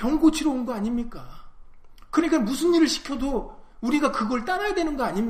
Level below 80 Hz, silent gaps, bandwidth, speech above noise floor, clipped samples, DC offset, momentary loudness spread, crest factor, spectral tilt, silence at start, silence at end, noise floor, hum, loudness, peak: -42 dBFS; none; 15.5 kHz; 21 dB; under 0.1%; under 0.1%; 11 LU; 16 dB; -4.5 dB/octave; 0 s; 0 s; -44 dBFS; none; -24 LUFS; -8 dBFS